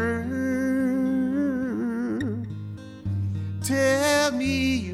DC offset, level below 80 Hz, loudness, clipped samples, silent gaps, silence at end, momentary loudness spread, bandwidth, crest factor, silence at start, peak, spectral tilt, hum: under 0.1%; -50 dBFS; -25 LUFS; under 0.1%; none; 0 s; 11 LU; 15.5 kHz; 16 dB; 0 s; -10 dBFS; -5 dB/octave; none